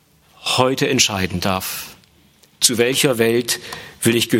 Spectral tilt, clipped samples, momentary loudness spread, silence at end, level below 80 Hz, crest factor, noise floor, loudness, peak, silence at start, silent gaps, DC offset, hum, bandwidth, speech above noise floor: -3 dB/octave; under 0.1%; 12 LU; 0 s; -56 dBFS; 20 dB; -53 dBFS; -18 LUFS; 0 dBFS; 0.4 s; none; under 0.1%; none; 17 kHz; 35 dB